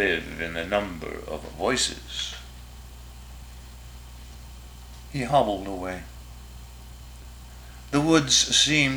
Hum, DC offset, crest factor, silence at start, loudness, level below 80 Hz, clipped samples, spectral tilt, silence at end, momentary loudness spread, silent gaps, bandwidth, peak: none; under 0.1%; 22 dB; 0 s; -24 LUFS; -44 dBFS; under 0.1%; -3 dB/octave; 0 s; 26 LU; none; over 20 kHz; -6 dBFS